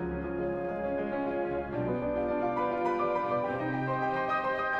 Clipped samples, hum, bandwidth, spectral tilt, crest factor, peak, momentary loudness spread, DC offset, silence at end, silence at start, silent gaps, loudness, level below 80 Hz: under 0.1%; none; 7.8 kHz; -8.5 dB/octave; 14 dB; -18 dBFS; 4 LU; under 0.1%; 0 s; 0 s; none; -31 LUFS; -52 dBFS